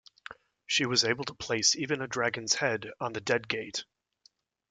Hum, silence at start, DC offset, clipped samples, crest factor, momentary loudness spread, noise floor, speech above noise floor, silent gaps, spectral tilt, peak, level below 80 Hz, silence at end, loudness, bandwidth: none; 0.3 s; under 0.1%; under 0.1%; 22 dB; 12 LU; -67 dBFS; 36 dB; none; -2 dB/octave; -10 dBFS; -68 dBFS; 0.9 s; -29 LUFS; 11 kHz